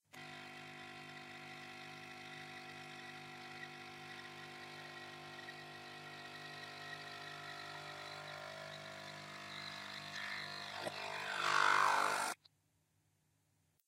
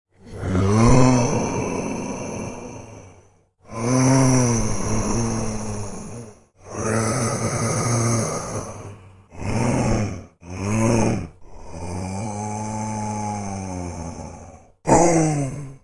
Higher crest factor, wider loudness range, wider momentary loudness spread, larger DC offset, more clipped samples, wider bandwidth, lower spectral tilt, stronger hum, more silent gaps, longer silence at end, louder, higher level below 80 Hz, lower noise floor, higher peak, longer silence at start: first, 26 dB vs 20 dB; first, 13 LU vs 4 LU; second, 16 LU vs 20 LU; neither; neither; first, 16 kHz vs 11.5 kHz; second, -2 dB/octave vs -5.5 dB/octave; neither; neither; first, 1.55 s vs 0.05 s; second, -43 LUFS vs -22 LUFS; second, -88 dBFS vs -36 dBFS; first, -79 dBFS vs -54 dBFS; second, -18 dBFS vs -2 dBFS; about the same, 0.15 s vs 0.25 s